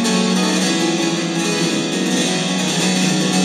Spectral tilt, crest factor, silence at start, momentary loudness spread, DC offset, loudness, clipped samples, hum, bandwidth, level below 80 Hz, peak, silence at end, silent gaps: -3.5 dB/octave; 12 dB; 0 s; 3 LU; under 0.1%; -17 LUFS; under 0.1%; none; 15 kHz; -72 dBFS; -4 dBFS; 0 s; none